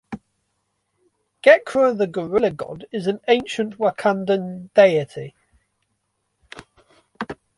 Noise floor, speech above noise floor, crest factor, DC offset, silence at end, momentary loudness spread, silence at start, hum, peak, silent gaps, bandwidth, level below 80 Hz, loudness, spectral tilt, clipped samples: -73 dBFS; 54 dB; 20 dB; under 0.1%; 0.25 s; 19 LU; 0.1 s; none; -2 dBFS; none; 11.5 kHz; -62 dBFS; -19 LUFS; -5.5 dB/octave; under 0.1%